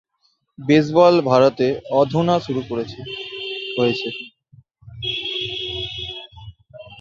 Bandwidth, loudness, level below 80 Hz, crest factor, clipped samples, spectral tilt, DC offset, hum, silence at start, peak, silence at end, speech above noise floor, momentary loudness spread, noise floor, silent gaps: 7.4 kHz; -20 LUFS; -52 dBFS; 18 dB; under 0.1%; -6.5 dB/octave; under 0.1%; none; 0.6 s; -2 dBFS; 0.05 s; 49 dB; 17 LU; -66 dBFS; none